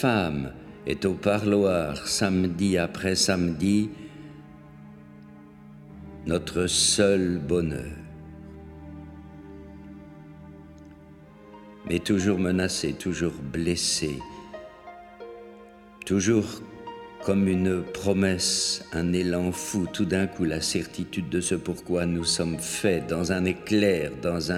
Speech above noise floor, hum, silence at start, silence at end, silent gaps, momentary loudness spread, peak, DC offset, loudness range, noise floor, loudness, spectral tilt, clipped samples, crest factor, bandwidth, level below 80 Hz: 23 dB; none; 0 s; 0 s; none; 22 LU; -6 dBFS; under 0.1%; 7 LU; -48 dBFS; -25 LUFS; -4.5 dB/octave; under 0.1%; 20 dB; 16 kHz; -50 dBFS